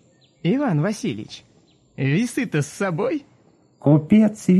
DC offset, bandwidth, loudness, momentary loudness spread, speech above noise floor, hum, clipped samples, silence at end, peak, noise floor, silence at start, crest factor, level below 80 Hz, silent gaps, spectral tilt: under 0.1%; 12.5 kHz; -21 LUFS; 13 LU; 37 dB; none; under 0.1%; 0 s; -4 dBFS; -56 dBFS; 0.45 s; 16 dB; -58 dBFS; none; -7 dB/octave